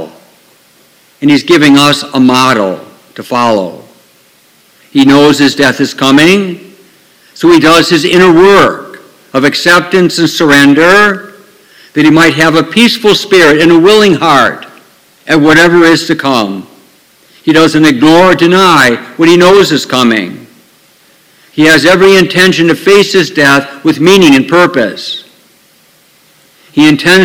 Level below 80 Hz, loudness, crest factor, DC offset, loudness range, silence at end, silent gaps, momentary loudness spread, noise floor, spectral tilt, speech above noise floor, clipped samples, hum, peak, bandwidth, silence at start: -42 dBFS; -6 LUFS; 8 dB; under 0.1%; 3 LU; 0 s; none; 11 LU; -45 dBFS; -4.5 dB/octave; 40 dB; 6%; none; 0 dBFS; 18.5 kHz; 0 s